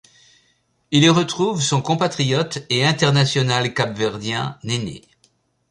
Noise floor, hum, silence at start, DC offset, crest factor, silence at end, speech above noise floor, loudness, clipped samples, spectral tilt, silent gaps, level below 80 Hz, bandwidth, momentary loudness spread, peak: -64 dBFS; none; 0.9 s; under 0.1%; 18 dB; 0.7 s; 45 dB; -19 LUFS; under 0.1%; -4.5 dB/octave; none; -56 dBFS; 11 kHz; 9 LU; -2 dBFS